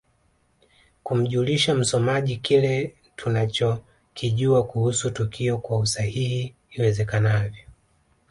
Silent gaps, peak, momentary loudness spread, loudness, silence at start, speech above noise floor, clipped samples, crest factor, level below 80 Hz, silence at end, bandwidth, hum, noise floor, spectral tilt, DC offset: none; -8 dBFS; 10 LU; -23 LUFS; 1.05 s; 43 dB; under 0.1%; 16 dB; -52 dBFS; 0.6 s; 11.5 kHz; none; -65 dBFS; -5 dB/octave; under 0.1%